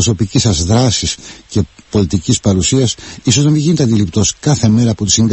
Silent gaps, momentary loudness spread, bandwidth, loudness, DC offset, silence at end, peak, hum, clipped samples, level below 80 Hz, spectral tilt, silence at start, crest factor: none; 8 LU; 8.6 kHz; -13 LUFS; under 0.1%; 0 s; 0 dBFS; none; under 0.1%; -30 dBFS; -5 dB/octave; 0 s; 12 dB